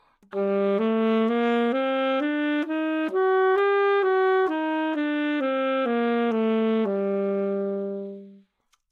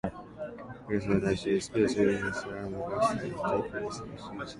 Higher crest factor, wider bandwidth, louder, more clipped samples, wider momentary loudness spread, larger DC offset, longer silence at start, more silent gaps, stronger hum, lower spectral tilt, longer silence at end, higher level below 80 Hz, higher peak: second, 12 dB vs 18 dB; second, 4.8 kHz vs 11.5 kHz; first, -24 LUFS vs -31 LUFS; neither; second, 7 LU vs 14 LU; neither; first, 0.3 s vs 0.05 s; neither; neither; first, -7.5 dB/octave vs -6 dB/octave; first, 0.55 s vs 0 s; second, -82 dBFS vs -54 dBFS; about the same, -12 dBFS vs -12 dBFS